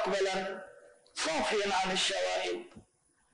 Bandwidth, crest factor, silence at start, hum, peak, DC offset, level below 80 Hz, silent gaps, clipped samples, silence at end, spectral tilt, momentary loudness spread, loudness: 10 kHz; 14 dB; 0 s; none; -20 dBFS; under 0.1%; -64 dBFS; none; under 0.1%; 0.55 s; -2 dB/octave; 14 LU; -31 LUFS